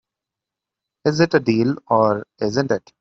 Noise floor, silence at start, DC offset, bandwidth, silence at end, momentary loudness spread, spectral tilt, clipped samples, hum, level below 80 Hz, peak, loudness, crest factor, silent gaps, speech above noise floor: -86 dBFS; 1.05 s; under 0.1%; 7.6 kHz; 0.2 s; 7 LU; -6.5 dB/octave; under 0.1%; none; -58 dBFS; -2 dBFS; -19 LUFS; 18 dB; none; 67 dB